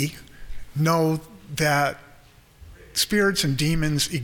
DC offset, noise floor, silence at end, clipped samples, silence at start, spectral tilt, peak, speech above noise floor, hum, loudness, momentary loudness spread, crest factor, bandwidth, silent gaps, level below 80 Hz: under 0.1%; -51 dBFS; 0 s; under 0.1%; 0 s; -4.5 dB/octave; -8 dBFS; 29 dB; none; -23 LUFS; 15 LU; 18 dB; 19 kHz; none; -42 dBFS